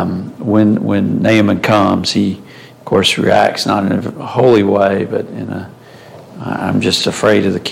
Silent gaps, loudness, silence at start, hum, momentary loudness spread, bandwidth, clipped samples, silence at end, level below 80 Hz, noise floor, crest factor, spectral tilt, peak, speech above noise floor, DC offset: none; -13 LUFS; 0 s; none; 13 LU; 16 kHz; under 0.1%; 0 s; -50 dBFS; -36 dBFS; 12 dB; -5.5 dB/octave; 0 dBFS; 24 dB; under 0.1%